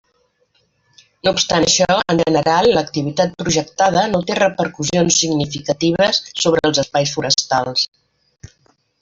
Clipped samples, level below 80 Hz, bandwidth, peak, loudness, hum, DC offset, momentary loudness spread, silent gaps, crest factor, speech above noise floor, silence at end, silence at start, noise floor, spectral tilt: under 0.1%; -48 dBFS; 8 kHz; 0 dBFS; -16 LUFS; none; under 0.1%; 6 LU; none; 16 dB; 46 dB; 1.15 s; 1.25 s; -63 dBFS; -3.5 dB/octave